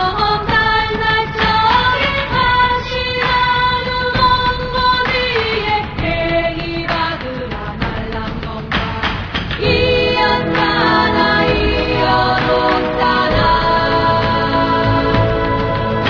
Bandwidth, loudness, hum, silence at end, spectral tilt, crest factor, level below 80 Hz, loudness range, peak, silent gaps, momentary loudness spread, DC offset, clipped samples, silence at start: 5.4 kHz; -15 LUFS; none; 0 s; -6.5 dB/octave; 14 dB; -28 dBFS; 5 LU; -2 dBFS; none; 8 LU; under 0.1%; under 0.1%; 0 s